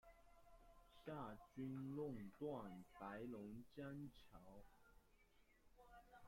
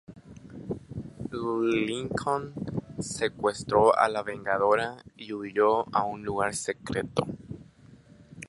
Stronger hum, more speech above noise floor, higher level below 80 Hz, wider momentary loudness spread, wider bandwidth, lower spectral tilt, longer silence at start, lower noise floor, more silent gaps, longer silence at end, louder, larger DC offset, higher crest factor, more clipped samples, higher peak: neither; second, 22 dB vs 26 dB; second, -74 dBFS vs -56 dBFS; about the same, 16 LU vs 18 LU; first, 16.5 kHz vs 11.5 kHz; first, -8 dB/octave vs -5 dB/octave; about the same, 0.05 s vs 0.1 s; first, -75 dBFS vs -54 dBFS; neither; about the same, 0 s vs 0 s; second, -54 LUFS vs -28 LUFS; neither; second, 16 dB vs 22 dB; neither; second, -40 dBFS vs -8 dBFS